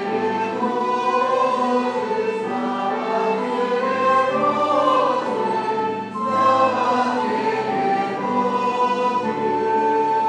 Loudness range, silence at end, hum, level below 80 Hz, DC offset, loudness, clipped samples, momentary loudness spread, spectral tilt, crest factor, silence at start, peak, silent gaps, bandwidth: 2 LU; 0 s; none; -74 dBFS; under 0.1%; -20 LUFS; under 0.1%; 5 LU; -5.5 dB/octave; 14 dB; 0 s; -6 dBFS; none; 9.8 kHz